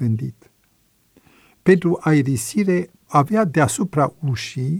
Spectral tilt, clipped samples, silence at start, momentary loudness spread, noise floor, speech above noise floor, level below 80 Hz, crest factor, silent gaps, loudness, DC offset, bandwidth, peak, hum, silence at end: -6.5 dB/octave; under 0.1%; 0 s; 8 LU; -61 dBFS; 43 dB; -56 dBFS; 18 dB; none; -19 LUFS; under 0.1%; 16.5 kHz; -2 dBFS; none; 0 s